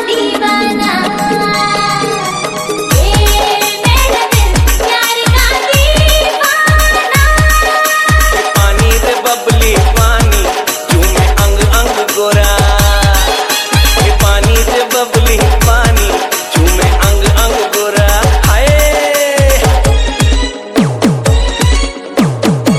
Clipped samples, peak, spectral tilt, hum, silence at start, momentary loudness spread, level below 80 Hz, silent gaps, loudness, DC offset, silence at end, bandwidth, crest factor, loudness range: 0.5%; 0 dBFS; -4 dB/octave; none; 0 s; 4 LU; -14 dBFS; none; -10 LUFS; under 0.1%; 0 s; 16.5 kHz; 8 dB; 2 LU